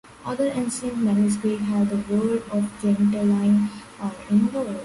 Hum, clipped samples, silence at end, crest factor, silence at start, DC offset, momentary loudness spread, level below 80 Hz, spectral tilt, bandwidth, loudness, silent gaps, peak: none; under 0.1%; 0 s; 12 dB; 0.2 s; under 0.1%; 8 LU; -56 dBFS; -7 dB/octave; 11.5 kHz; -23 LUFS; none; -10 dBFS